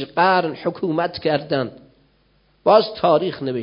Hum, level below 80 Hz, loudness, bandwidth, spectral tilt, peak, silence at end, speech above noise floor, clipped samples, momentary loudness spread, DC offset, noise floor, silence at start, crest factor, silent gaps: none; -58 dBFS; -19 LUFS; 5.4 kHz; -10.5 dB/octave; -2 dBFS; 0 s; 41 dB; under 0.1%; 9 LU; under 0.1%; -60 dBFS; 0 s; 18 dB; none